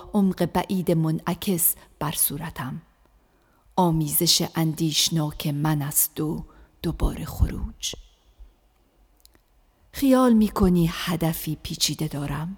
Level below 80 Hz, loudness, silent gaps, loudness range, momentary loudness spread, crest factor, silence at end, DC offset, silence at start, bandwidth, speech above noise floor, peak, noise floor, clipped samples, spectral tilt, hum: -38 dBFS; -23 LUFS; none; 9 LU; 12 LU; 20 dB; 0 s; under 0.1%; 0 s; over 20 kHz; 38 dB; -4 dBFS; -61 dBFS; under 0.1%; -4.5 dB/octave; none